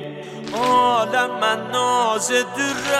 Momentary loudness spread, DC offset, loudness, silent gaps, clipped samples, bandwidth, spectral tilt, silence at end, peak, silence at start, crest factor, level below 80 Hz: 9 LU; under 0.1%; -19 LUFS; none; under 0.1%; 16 kHz; -2.5 dB/octave; 0 s; -6 dBFS; 0 s; 14 dB; -60 dBFS